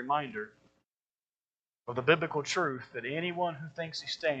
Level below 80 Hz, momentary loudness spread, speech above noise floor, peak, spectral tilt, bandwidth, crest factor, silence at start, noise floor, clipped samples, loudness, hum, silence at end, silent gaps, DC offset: -78 dBFS; 12 LU; over 57 dB; -8 dBFS; -4.5 dB/octave; 8.8 kHz; 26 dB; 0 s; under -90 dBFS; under 0.1%; -33 LUFS; none; 0 s; 1.29-1.33 s, 1.40-1.44 s, 1.69-1.73 s; under 0.1%